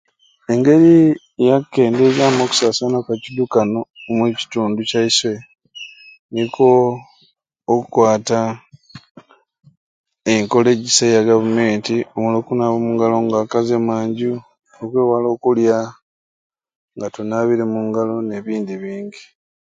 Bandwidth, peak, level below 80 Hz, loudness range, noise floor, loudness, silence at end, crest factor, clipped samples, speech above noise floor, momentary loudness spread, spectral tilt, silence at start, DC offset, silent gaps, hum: 9.4 kHz; 0 dBFS; -60 dBFS; 6 LU; -58 dBFS; -16 LUFS; 0.4 s; 18 dB; under 0.1%; 43 dB; 15 LU; -5 dB/octave; 0.5 s; under 0.1%; 3.90-3.94 s, 6.19-6.29 s, 9.11-9.15 s, 9.77-10.04 s, 16.02-16.50 s, 16.76-16.88 s; none